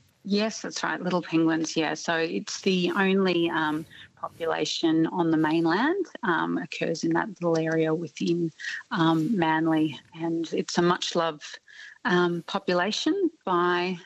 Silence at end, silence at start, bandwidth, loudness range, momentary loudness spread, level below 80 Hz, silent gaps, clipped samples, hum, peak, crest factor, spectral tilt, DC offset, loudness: 0.05 s; 0.25 s; 8.4 kHz; 1 LU; 8 LU; -72 dBFS; none; under 0.1%; none; -10 dBFS; 16 dB; -5 dB/octave; under 0.1%; -26 LUFS